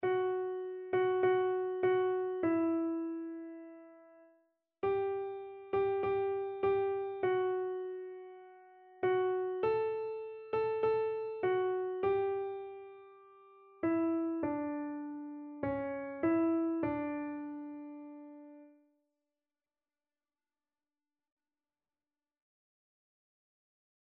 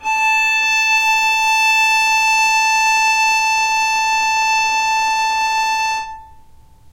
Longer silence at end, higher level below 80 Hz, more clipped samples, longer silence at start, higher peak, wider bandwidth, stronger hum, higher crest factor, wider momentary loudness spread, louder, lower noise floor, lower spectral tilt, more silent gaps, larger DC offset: first, 5.45 s vs 0.5 s; second, -72 dBFS vs -50 dBFS; neither; about the same, 0 s vs 0 s; second, -20 dBFS vs -6 dBFS; second, 4.3 kHz vs 16 kHz; neither; first, 16 dB vs 10 dB; first, 16 LU vs 4 LU; second, -35 LUFS vs -14 LUFS; first, under -90 dBFS vs -43 dBFS; first, -5.5 dB/octave vs 2.5 dB/octave; neither; neither